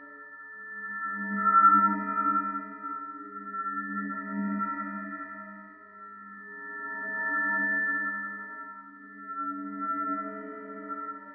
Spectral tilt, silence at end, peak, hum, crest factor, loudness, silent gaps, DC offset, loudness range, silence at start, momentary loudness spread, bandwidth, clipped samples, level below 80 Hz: -11 dB/octave; 0 s; -10 dBFS; none; 20 dB; -29 LUFS; none; under 0.1%; 9 LU; 0 s; 20 LU; 2.6 kHz; under 0.1%; -86 dBFS